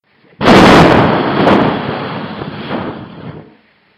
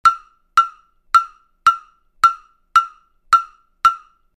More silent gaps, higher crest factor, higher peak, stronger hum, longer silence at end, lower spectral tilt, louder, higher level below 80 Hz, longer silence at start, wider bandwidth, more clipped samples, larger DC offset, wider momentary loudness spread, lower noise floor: neither; second, 12 dB vs 18 dB; about the same, 0 dBFS vs -2 dBFS; neither; first, 0.55 s vs 0.4 s; first, -6 dB/octave vs 1 dB/octave; first, -9 LUFS vs -17 LUFS; first, -34 dBFS vs -56 dBFS; first, 0.4 s vs 0.05 s; about the same, 15 kHz vs 14.5 kHz; first, 0.6% vs under 0.1%; neither; first, 23 LU vs 15 LU; first, -47 dBFS vs -38 dBFS